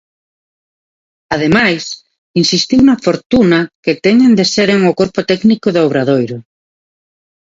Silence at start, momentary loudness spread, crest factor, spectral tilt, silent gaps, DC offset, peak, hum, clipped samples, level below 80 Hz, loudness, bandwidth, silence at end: 1.3 s; 10 LU; 12 dB; -5 dB/octave; 2.18-2.34 s, 3.26-3.30 s, 3.75-3.83 s; under 0.1%; 0 dBFS; none; under 0.1%; -46 dBFS; -12 LUFS; 7.8 kHz; 1.05 s